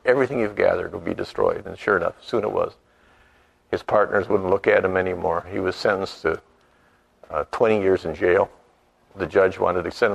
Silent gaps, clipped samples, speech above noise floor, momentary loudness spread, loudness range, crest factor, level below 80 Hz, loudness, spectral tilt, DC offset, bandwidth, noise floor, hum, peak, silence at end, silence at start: none; under 0.1%; 38 dB; 10 LU; 2 LU; 20 dB; -52 dBFS; -22 LUFS; -6.5 dB/octave; under 0.1%; 11 kHz; -59 dBFS; none; -4 dBFS; 0 s; 0.05 s